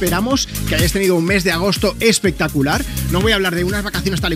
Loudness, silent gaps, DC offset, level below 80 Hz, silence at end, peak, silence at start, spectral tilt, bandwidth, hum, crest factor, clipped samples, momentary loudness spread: -16 LUFS; none; under 0.1%; -28 dBFS; 0 s; 0 dBFS; 0 s; -4.5 dB/octave; 16 kHz; none; 16 dB; under 0.1%; 5 LU